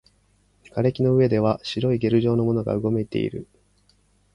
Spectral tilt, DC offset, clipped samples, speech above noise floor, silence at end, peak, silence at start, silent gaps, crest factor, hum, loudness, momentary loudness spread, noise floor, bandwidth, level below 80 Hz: -8.5 dB/octave; under 0.1%; under 0.1%; 41 dB; 0.9 s; -6 dBFS; 0.75 s; none; 16 dB; 50 Hz at -50 dBFS; -22 LUFS; 8 LU; -62 dBFS; 10.5 kHz; -52 dBFS